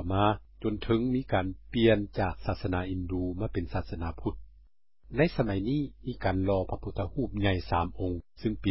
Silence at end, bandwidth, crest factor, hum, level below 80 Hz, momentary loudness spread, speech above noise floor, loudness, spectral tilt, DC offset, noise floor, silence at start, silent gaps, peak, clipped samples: 0 s; 5.8 kHz; 20 dB; none; -42 dBFS; 8 LU; 28 dB; -31 LUFS; -11 dB/octave; 0.6%; -58 dBFS; 0 s; none; -10 dBFS; under 0.1%